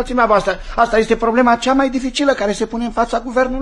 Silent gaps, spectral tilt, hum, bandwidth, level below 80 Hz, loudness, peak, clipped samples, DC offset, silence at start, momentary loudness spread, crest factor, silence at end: none; -4.5 dB/octave; none; 11.5 kHz; -34 dBFS; -16 LUFS; 0 dBFS; under 0.1%; under 0.1%; 0 s; 6 LU; 16 dB; 0 s